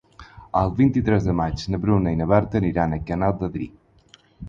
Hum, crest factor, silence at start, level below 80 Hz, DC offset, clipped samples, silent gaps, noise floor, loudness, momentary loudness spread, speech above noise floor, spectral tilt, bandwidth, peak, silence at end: none; 18 dB; 0.2 s; -38 dBFS; under 0.1%; under 0.1%; none; -54 dBFS; -22 LUFS; 8 LU; 33 dB; -8.5 dB/octave; 7.6 kHz; -4 dBFS; 0 s